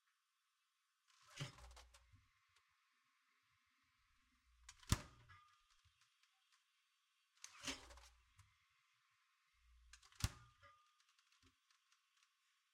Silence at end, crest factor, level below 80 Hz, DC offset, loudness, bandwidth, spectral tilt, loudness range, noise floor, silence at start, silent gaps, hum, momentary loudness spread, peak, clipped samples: 1.25 s; 38 dB; -64 dBFS; under 0.1%; -49 LUFS; 15.5 kHz; -3.5 dB/octave; 9 LU; -87 dBFS; 1.2 s; none; none; 23 LU; -20 dBFS; under 0.1%